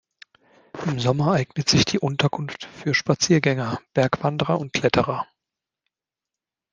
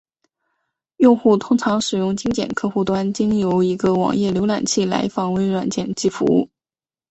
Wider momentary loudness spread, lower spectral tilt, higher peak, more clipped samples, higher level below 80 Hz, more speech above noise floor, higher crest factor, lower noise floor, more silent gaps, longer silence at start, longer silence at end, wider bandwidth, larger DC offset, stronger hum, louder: first, 12 LU vs 6 LU; about the same, -5 dB/octave vs -5.5 dB/octave; about the same, -2 dBFS vs -2 dBFS; neither; about the same, -54 dBFS vs -52 dBFS; second, 66 dB vs over 72 dB; about the same, 20 dB vs 18 dB; about the same, -88 dBFS vs under -90 dBFS; neither; second, 0.75 s vs 1 s; first, 1.5 s vs 0.65 s; first, 10 kHz vs 8.4 kHz; neither; neither; second, -22 LUFS vs -19 LUFS